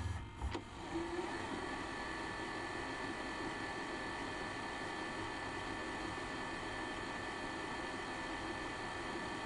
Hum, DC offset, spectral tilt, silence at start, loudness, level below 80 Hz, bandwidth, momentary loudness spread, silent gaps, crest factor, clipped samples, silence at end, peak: none; under 0.1%; -4.5 dB/octave; 0 s; -43 LUFS; -56 dBFS; 11.5 kHz; 1 LU; none; 14 dB; under 0.1%; 0 s; -28 dBFS